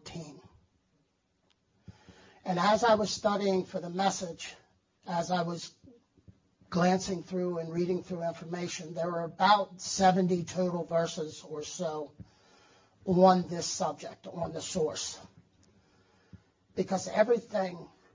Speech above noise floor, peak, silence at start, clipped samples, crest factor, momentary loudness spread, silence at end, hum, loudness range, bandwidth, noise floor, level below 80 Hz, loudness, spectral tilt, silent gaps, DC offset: 44 dB; -10 dBFS; 0.05 s; under 0.1%; 22 dB; 17 LU; 0.3 s; none; 5 LU; 7.6 kHz; -74 dBFS; -66 dBFS; -30 LUFS; -5 dB/octave; none; under 0.1%